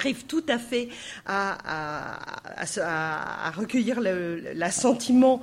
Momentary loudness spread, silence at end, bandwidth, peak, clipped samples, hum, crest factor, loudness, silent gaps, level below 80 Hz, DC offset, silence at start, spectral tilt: 12 LU; 0 s; 13.5 kHz; -8 dBFS; under 0.1%; none; 18 dB; -27 LUFS; none; -62 dBFS; under 0.1%; 0 s; -4 dB/octave